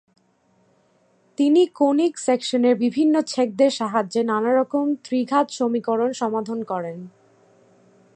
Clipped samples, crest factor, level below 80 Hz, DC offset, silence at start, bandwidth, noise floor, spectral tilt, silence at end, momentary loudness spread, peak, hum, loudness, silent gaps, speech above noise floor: under 0.1%; 16 dB; -78 dBFS; under 0.1%; 1.4 s; 9.6 kHz; -62 dBFS; -5 dB/octave; 1.05 s; 8 LU; -6 dBFS; none; -21 LUFS; none; 42 dB